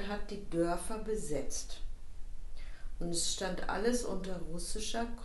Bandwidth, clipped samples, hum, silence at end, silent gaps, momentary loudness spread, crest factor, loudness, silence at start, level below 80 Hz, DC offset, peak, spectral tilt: 12 kHz; under 0.1%; none; 0 s; none; 18 LU; 16 dB; -37 LUFS; 0 s; -42 dBFS; under 0.1%; -18 dBFS; -3.5 dB/octave